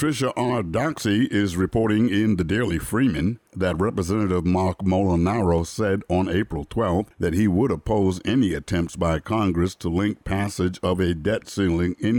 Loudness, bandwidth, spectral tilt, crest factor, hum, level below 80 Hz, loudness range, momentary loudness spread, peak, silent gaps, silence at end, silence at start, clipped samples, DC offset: -23 LUFS; 19.5 kHz; -6.5 dB/octave; 12 dB; none; -40 dBFS; 1 LU; 5 LU; -10 dBFS; none; 0 s; 0 s; under 0.1%; under 0.1%